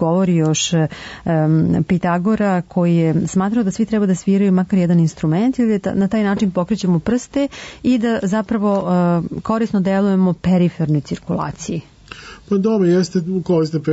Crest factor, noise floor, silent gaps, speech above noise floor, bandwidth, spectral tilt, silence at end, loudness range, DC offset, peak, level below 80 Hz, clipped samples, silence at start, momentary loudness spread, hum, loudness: 10 dB; -37 dBFS; none; 21 dB; 8 kHz; -6.5 dB/octave; 0 s; 2 LU; under 0.1%; -6 dBFS; -46 dBFS; under 0.1%; 0 s; 7 LU; none; -17 LUFS